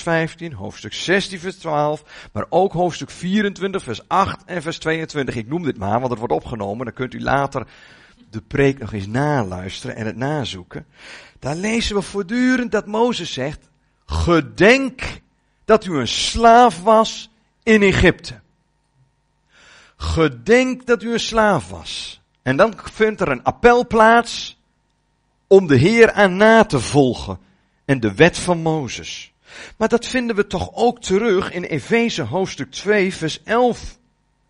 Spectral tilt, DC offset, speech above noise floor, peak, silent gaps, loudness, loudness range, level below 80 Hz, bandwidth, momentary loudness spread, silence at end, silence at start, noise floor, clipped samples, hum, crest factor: -5 dB/octave; under 0.1%; 47 dB; 0 dBFS; none; -18 LUFS; 8 LU; -40 dBFS; 10.5 kHz; 17 LU; 0.55 s; 0 s; -65 dBFS; under 0.1%; none; 18 dB